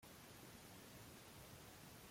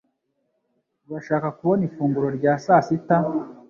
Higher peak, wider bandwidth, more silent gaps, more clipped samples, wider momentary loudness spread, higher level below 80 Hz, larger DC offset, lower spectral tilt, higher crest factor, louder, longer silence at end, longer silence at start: second, -46 dBFS vs -4 dBFS; first, 16.5 kHz vs 7.2 kHz; neither; neither; second, 0 LU vs 8 LU; second, -74 dBFS vs -62 dBFS; neither; second, -3.5 dB/octave vs -8.5 dB/octave; about the same, 14 dB vs 18 dB; second, -59 LUFS vs -22 LUFS; second, 0 s vs 0.15 s; second, 0 s vs 1.1 s